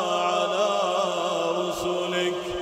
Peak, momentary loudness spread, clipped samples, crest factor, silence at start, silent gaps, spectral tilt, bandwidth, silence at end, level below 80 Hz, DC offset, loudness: -10 dBFS; 3 LU; under 0.1%; 14 dB; 0 s; none; -3.5 dB/octave; 16 kHz; 0 s; -56 dBFS; under 0.1%; -25 LUFS